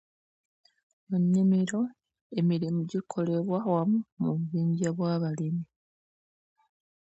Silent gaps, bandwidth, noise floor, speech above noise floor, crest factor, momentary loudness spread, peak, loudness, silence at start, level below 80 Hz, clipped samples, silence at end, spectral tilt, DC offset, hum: 2.21-2.30 s, 4.12-4.17 s; 8.2 kHz; under -90 dBFS; over 63 dB; 16 dB; 8 LU; -14 dBFS; -29 LUFS; 1.1 s; -74 dBFS; under 0.1%; 1.4 s; -8 dB/octave; under 0.1%; none